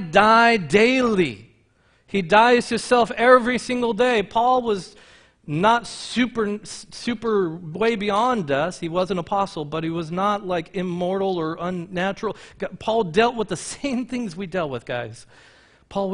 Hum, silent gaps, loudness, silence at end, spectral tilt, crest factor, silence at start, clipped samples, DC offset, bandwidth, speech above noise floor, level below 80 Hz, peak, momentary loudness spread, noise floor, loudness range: none; none; -21 LUFS; 0 s; -5 dB/octave; 22 dB; 0 s; under 0.1%; under 0.1%; 10.5 kHz; 39 dB; -54 dBFS; 0 dBFS; 13 LU; -60 dBFS; 7 LU